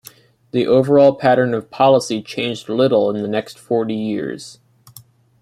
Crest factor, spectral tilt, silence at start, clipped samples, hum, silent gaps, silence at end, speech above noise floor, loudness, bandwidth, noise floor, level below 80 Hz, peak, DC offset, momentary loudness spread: 16 dB; -6 dB/octave; 0.55 s; under 0.1%; none; none; 0.45 s; 30 dB; -17 LUFS; 15 kHz; -46 dBFS; -62 dBFS; -2 dBFS; under 0.1%; 12 LU